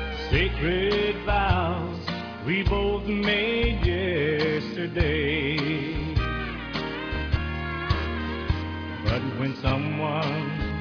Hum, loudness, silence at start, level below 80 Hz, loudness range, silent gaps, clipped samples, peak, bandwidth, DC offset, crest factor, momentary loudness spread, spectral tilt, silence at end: none; -26 LUFS; 0 s; -34 dBFS; 4 LU; none; under 0.1%; -10 dBFS; 5.4 kHz; under 0.1%; 16 dB; 7 LU; -7.5 dB/octave; 0 s